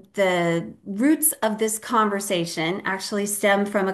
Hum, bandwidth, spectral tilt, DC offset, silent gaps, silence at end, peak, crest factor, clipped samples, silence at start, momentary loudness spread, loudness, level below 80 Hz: none; 12.5 kHz; -3.5 dB/octave; under 0.1%; none; 0 s; -6 dBFS; 16 dB; under 0.1%; 0.15 s; 6 LU; -22 LUFS; -70 dBFS